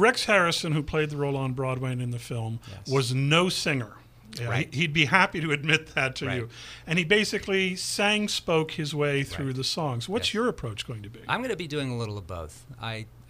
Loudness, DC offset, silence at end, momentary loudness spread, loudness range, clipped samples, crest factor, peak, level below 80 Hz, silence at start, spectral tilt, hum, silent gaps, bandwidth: -26 LUFS; under 0.1%; 0.1 s; 14 LU; 5 LU; under 0.1%; 24 dB; -4 dBFS; -52 dBFS; 0 s; -4.5 dB/octave; none; none; 15.5 kHz